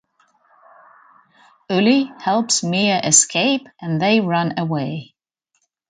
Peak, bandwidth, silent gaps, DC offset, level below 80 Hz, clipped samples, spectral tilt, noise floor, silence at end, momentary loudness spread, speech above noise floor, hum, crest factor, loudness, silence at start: 0 dBFS; 9.6 kHz; none; under 0.1%; -64 dBFS; under 0.1%; -3.5 dB/octave; -72 dBFS; 0.85 s; 11 LU; 54 dB; none; 20 dB; -17 LUFS; 1.7 s